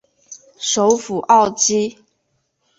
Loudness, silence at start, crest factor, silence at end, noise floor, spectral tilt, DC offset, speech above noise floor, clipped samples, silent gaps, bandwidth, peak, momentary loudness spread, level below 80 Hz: -16 LUFS; 0.3 s; 18 dB; 0.85 s; -69 dBFS; -2.5 dB/octave; under 0.1%; 53 dB; under 0.1%; none; 8 kHz; -2 dBFS; 9 LU; -60 dBFS